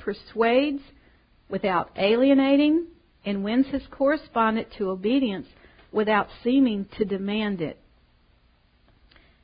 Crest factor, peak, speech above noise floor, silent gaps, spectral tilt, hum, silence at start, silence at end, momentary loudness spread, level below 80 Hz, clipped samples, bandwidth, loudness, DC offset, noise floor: 18 dB; -8 dBFS; 38 dB; none; -10.5 dB/octave; none; 0 s; 1.7 s; 12 LU; -56 dBFS; under 0.1%; 5.2 kHz; -24 LUFS; under 0.1%; -61 dBFS